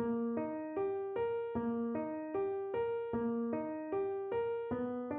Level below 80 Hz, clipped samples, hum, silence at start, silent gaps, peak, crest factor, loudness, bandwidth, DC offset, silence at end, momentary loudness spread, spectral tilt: -68 dBFS; under 0.1%; none; 0 s; none; -24 dBFS; 12 dB; -38 LUFS; 4 kHz; under 0.1%; 0 s; 3 LU; -7 dB/octave